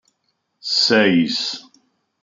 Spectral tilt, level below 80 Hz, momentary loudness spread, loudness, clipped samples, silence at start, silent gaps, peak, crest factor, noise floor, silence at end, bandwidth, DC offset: -4 dB/octave; -70 dBFS; 17 LU; -17 LUFS; under 0.1%; 0.65 s; none; -2 dBFS; 18 dB; -71 dBFS; 0.6 s; 9.4 kHz; under 0.1%